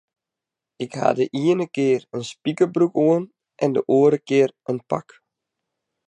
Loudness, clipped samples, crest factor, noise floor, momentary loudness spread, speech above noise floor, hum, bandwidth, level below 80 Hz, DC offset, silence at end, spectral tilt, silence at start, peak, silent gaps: -21 LUFS; under 0.1%; 20 dB; -87 dBFS; 12 LU; 66 dB; none; 9.8 kHz; -72 dBFS; under 0.1%; 1.05 s; -7 dB/octave; 0.8 s; -2 dBFS; none